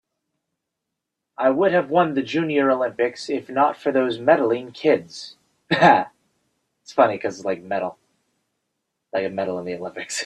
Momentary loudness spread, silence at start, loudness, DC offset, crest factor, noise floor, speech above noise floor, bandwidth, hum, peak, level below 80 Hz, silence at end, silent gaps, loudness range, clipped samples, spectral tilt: 12 LU; 1.4 s; -21 LUFS; under 0.1%; 20 dB; -82 dBFS; 61 dB; 12.5 kHz; none; -2 dBFS; -68 dBFS; 0 s; none; 6 LU; under 0.1%; -5 dB/octave